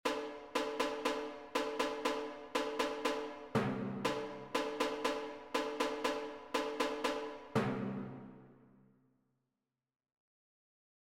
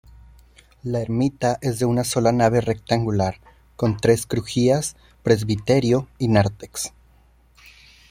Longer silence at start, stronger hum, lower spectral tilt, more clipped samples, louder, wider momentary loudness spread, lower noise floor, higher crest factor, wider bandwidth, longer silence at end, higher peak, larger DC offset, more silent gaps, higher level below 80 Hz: second, 0.05 s vs 0.85 s; neither; second, -4.5 dB/octave vs -6 dB/octave; neither; second, -38 LUFS vs -21 LUFS; second, 6 LU vs 11 LU; first, under -90 dBFS vs -55 dBFS; about the same, 18 dB vs 20 dB; about the same, 16 kHz vs 16.5 kHz; first, 2.4 s vs 0.4 s; second, -20 dBFS vs -2 dBFS; neither; neither; second, -70 dBFS vs -48 dBFS